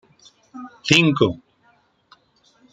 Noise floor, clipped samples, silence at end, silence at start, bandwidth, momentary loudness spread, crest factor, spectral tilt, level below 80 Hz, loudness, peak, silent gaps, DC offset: -60 dBFS; under 0.1%; 1.35 s; 0.55 s; 9.4 kHz; 25 LU; 24 dB; -4.5 dB/octave; -58 dBFS; -17 LUFS; 0 dBFS; none; under 0.1%